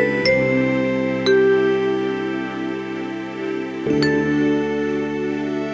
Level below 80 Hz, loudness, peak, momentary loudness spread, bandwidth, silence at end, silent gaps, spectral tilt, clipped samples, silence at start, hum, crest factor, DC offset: -50 dBFS; -20 LUFS; -6 dBFS; 10 LU; 8 kHz; 0 s; none; -6.5 dB/octave; under 0.1%; 0 s; none; 14 dB; under 0.1%